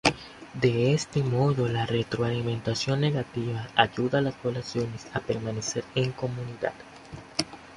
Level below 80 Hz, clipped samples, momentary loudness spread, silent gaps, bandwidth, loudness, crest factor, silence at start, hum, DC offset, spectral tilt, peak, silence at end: -54 dBFS; under 0.1%; 9 LU; none; 11.5 kHz; -28 LUFS; 24 dB; 0.05 s; none; under 0.1%; -5.5 dB/octave; -2 dBFS; 0 s